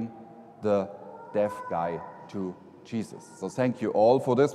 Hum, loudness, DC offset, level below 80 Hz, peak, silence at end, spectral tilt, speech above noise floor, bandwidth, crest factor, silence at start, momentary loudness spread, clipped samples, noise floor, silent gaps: none; -28 LUFS; under 0.1%; -72 dBFS; -8 dBFS; 0 s; -7 dB/octave; 21 dB; 12.5 kHz; 20 dB; 0 s; 19 LU; under 0.1%; -48 dBFS; none